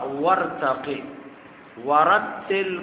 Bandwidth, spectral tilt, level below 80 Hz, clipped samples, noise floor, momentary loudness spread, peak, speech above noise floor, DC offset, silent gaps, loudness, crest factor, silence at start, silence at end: 4 kHz; -8.5 dB/octave; -64 dBFS; under 0.1%; -44 dBFS; 17 LU; -4 dBFS; 22 dB; under 0.1%; none; -22 LUFS; 18 dB; 0 s; 0 s